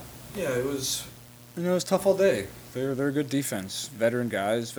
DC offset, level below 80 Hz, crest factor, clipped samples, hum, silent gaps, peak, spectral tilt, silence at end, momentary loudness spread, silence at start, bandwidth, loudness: under 0.1%; -58 dBFS; 18 dB; under 0.1%; none; none; -10 dBFS; -4.5 dB/octave; 0 s; 12 LU; 0 s; over 20 kHz; -27 LUFS